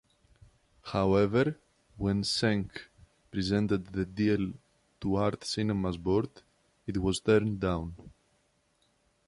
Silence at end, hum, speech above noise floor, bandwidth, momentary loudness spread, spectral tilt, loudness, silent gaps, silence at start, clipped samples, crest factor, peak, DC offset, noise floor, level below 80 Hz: 1.2 s; none; 42 dB; 11.5 kHz; 15 LU; -6 dB/octave; -30 LUFS; none; 0.85 s; under 0.1%; 20 dB; -12 dBFS; under 0.1%; -72 dBFS; -50 dBFS